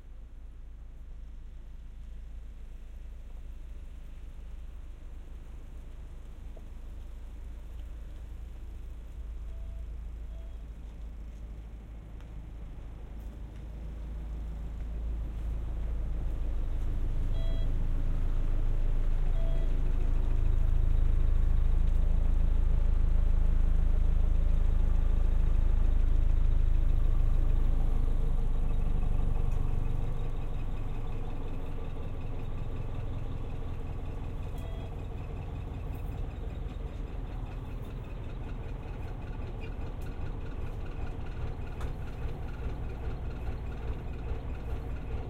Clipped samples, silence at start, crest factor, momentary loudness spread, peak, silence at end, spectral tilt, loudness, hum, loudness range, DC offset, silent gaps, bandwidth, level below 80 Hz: under 0.1%; 0.05 s; 14 dB; 17 LU; -16 dBFS; 0 s; -8 dB/octave; -36 LUFS; none; 16 LU; under 0.1%; none; 4 kHz; -30 dBFS